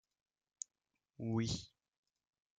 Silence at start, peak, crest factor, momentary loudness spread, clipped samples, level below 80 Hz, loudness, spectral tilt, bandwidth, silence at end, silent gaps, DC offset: 1.2 s; -24 dBFS; 22 dB; 12 LU; under 0.1%; -68 dBFS; -42 LUFS; -5 dB/octave; 9.4 kHz; 0.9 s; none; under 0.1%